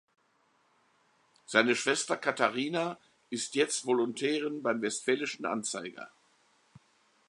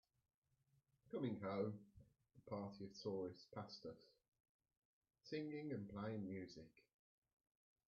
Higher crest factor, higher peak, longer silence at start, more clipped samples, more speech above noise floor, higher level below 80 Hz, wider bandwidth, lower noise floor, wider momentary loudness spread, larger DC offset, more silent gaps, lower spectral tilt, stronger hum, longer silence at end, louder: first, 26 dB vs 20 dB; first, -6 dBFS vs -32 dBFS; first, 1.5 s vs 1.05 s; neither; first, 40 dB vs 34 dB; about the same, -84 dBFS vs -82 dBFS; first, 11.5 kHz vs 7 kHz; second, -71 dBFS vs -83 dBFS; second, 12 LU vs 17 LU; neither; second, none vs 4.28-4.32 s, 4.40-4.59 s, 4.77-5.02 s; second, -2.5 dB/octave vs -6 dB/octave; neither; about the same, 1.2 s vs 1.1 s; first, -31 LUFS vs -50 LUFS